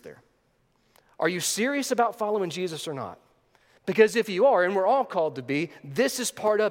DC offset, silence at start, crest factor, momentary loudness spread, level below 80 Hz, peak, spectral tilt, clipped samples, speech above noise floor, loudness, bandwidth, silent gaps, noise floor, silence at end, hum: under 0.1%; 0.05 s; 22 dB; 11 LU; -76 dBFS; -4 dBFS; -3.5 dB/octave; under 0.1%; 43 dB; -25 LUFS; 17 kHz; none; -68 dBFS; 0 s; none